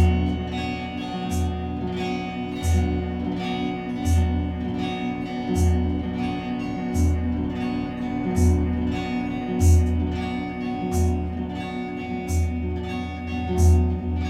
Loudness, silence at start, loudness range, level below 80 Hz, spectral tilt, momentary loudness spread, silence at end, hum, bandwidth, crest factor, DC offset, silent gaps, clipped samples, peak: -25 LUFS; 0 s; 3 LU; -30 dBFS; -7 dB/octave; 9 LU; 0 s; none; 13 kHz; 16 dB; under 0.1%; none; under 0.1%; -8 dBFS